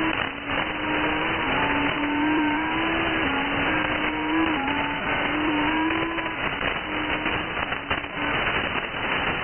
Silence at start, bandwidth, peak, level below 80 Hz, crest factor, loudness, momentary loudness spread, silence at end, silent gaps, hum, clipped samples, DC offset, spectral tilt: 0 s; 3.4 kHz; -10 dBFS; -44 dBFS; 16 dB; -24 LUFS; 4 LU; 0 s; none; none; under 0.1%; under 0.1%; -0.5 dB/octave